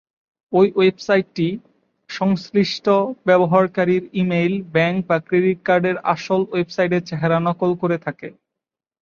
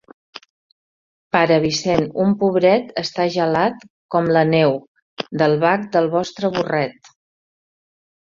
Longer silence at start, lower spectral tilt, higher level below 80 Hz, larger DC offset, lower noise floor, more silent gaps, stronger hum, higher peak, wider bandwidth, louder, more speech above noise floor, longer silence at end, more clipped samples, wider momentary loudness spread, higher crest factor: first, 0.5 s vs 0.35 s; about the same, -7 dB/octave vs -6 dB/octave; second, -62 dBFS vs -56 dBFS; neither; second, -86 dBFS vs under -90 dBFS; second, none vs 0.50-1.31 s, 3.90-4.09 s, 4.88-4.95 s, 5.02-5.17 s; neither; about the same, -2 dBFS vs -2 dBFS; about the same, 7 kHz vs 7.6 kHz; about the same, -19 LUFS vs -18 LUFS; second, 67 dB vs over 73 dB; second, 0.7 s vs 1.35 s; neither; about the same, 7 LU vs 8 LU; about the same, 18 dB vs 18 dB